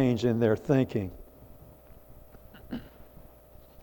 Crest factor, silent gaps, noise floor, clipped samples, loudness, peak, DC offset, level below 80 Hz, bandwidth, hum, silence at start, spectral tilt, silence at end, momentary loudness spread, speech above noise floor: 20 dB; none; -53 dBFS; under 0.1%; -29 LUFS; -12 dBFS; under 0.1%; -54 dBFS; 18 kHz; none; 0 s; -8 dB/octave; 0.8 s; 26 LU; 27 dB